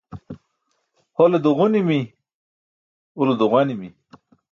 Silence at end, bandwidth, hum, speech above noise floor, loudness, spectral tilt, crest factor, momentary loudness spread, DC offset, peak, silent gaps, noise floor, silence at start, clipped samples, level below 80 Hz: 0.65 s; 7 kHz; none; 54 dB; -19 LUFS; -8.5 dB/octave; 18 dB; 22 LU; under 0.1%; -4 dBFS; 2.34-3.15 s; -71 dBFS; 0.1 s; under 0.1%; -62 dBFS